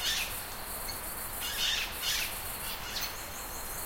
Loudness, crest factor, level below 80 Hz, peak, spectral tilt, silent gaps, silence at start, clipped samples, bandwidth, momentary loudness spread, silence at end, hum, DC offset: -33 LUFS; 18 dB; -48 dBFS; -18 dBFS; -0.5 dB/octave; none; 0 s; under 0.1%; 16.5 kHz; 8 LU; 0 s; none; under 0.1%